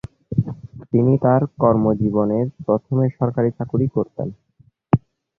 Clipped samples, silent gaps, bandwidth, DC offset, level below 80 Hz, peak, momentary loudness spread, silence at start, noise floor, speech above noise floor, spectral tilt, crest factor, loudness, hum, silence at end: under 0.1%; none; 3.1 kHz; under 0.1%; -48 dBFS; -2 dBFS; 9 LU; 0.3 s; -57 dBFS; 38 dB; -12.5 dB/octave; 18 dB; -20 LUFS; none; 0.4 s